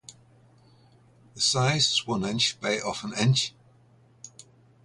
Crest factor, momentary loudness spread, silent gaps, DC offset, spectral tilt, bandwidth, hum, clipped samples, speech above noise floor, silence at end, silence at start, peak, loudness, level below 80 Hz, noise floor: 20 dB; 16 LU; none; under 0.1%; -3.5 dB/octave; 11.5 kHz; none; under 0.1%; 33 dB; 0.55 s; 0.1 s; -10 dBFS; -25 LUFS; -62 dBFS; -58 dBFS